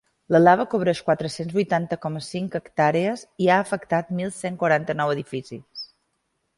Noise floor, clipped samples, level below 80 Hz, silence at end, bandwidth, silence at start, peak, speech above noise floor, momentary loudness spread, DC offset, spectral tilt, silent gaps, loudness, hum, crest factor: -74 dBFS; under 0.1%; -62 dBFS; 0.75 s; 11.5 kHz; 0.3 s; -4 dBFS; 52 dB; 15 LU; under 0.1%; -6 dB/octave; none; -23 LUFS; none; 18 dB